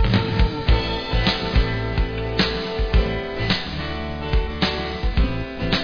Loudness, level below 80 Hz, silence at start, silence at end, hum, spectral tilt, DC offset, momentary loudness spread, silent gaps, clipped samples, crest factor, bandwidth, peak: -22 LUFS; -24 dBFS; 0 s; 0 s; none; -6.5 dB/octave; 0.5%; 5 LU; none; under 0.1%; 16 dB; 5.4 kHz; -4 dBFS